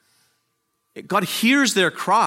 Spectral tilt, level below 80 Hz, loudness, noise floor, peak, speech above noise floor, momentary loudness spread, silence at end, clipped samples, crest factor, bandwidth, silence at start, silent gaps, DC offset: -3 dB/octave; -76 dBFS; -19 LUFS; -72 dBFS; -4 dBFS; 53 dB; 7 LU; 0 s; under 0.1%; 18 dB; 16.5 kHz; 0.95 s; none; under 0.1%